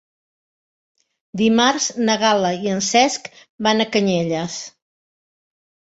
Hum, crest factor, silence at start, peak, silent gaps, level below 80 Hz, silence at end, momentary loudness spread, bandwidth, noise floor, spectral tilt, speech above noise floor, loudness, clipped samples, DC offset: none; 18 dB; 1.35 s; -2 dBFS; 3.49-3.58 s; -60 dBFS; 1.25 s; 14 LU; 8 kHz; under -90 dBFS; -3.5 dB/octave; over 72 dB; -18 LUFS; under 0.1%; under 0.1%